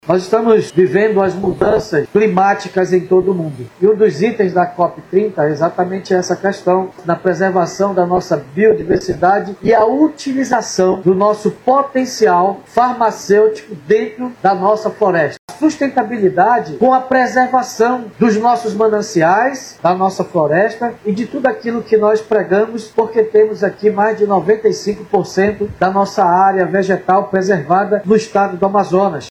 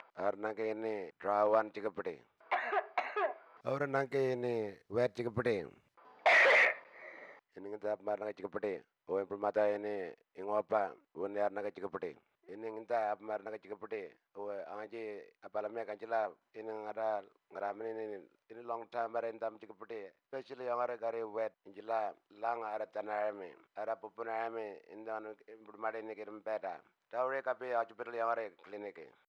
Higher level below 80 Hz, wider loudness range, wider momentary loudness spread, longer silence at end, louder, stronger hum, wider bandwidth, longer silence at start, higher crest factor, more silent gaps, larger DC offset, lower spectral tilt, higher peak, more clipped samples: first, -50 dBFS vs -84 dBFS; second, 2 LU vs 11 LU; second, 5 LU vs 14 LU; second, 0 s vs 0.2 s; first, -14 LUFS vs -37 LUFS; neither; first, 12.5 kHz vs 10.5 kHz; about the same, 0.05 s vs 0 s; second, 14 dB vs 20 dB; first, 15.39-15.48 s vs none; neither; about the same, -6 dB/octave vs -5.5 dB/octave; first, 0 dBFS vs -18 dBFS; neither